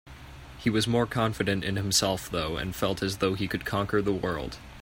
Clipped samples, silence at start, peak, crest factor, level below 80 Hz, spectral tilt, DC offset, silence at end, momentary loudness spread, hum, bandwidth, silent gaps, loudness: under 0.1%; 0.05 s; -10 dBFS; 18 dB; -48 dBFS; -4.5 dB/octave; under 0.1%; 0 s; 9 LU; none; 16.5 kHz; none; -28 LUFS